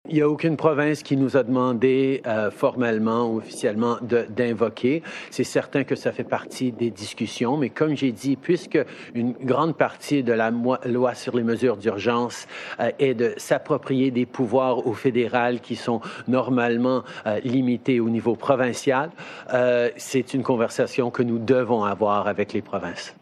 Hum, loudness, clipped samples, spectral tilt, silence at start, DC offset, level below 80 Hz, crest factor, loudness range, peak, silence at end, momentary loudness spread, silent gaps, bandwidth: none; -23 LUFS; under 0.1%; -6 dB/octave; 0.05 s; under 0.1%; -72 dBFS; 18 dB; 3 LU; -4 dBFS; 0.1 s; 7 LU; none; 13 kHz